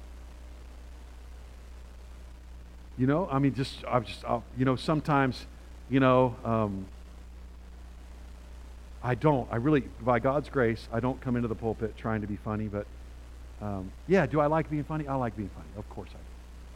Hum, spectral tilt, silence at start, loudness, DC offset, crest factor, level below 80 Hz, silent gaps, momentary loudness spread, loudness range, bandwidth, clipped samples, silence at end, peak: none; -8 dB/octave; 0 s; -29 LUFS; under 0.1%; 22 dB; -46 dBFS; none; 23 LU; 5 LU; 13.5 kHz; under 0.1%; 0 s; -10 dBFS